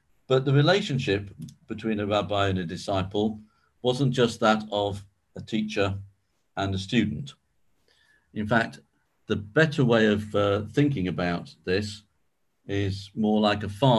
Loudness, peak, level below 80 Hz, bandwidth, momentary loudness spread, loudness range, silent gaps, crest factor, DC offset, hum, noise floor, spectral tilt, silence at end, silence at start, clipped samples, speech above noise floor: -26 LUFS; -6 dBFS; -50 dBFS; 12 kHz; 16 LU; 5 LU; none; 20 dB; under 0.1%; none; -76 dBFS; -6.5 dB/octave; 0 s; 0.3 s; under 0.1%; 51 dB